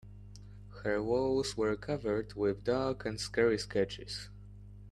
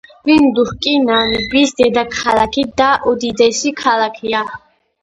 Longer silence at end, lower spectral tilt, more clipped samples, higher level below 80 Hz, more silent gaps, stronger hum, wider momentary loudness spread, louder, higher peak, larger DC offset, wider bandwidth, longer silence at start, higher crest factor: second, 0 s vs 0.45 s; first, -5 dB/octave vs -3.5 dB/octave; neither; second, -54 dBFS vs -44 dBFS; neither; first, 50 Hz at -50 dBFS vs none; first, 22 LU vs 6 LU; second, -34 LUFS vs -14 LUFS; second, -14 dBFS vs 0 dBFS; neither; first, 12.5 kHz vs 10.5 kHz; second, 0.05 s vs 0.25 s; first, 20 dB vs 14 dB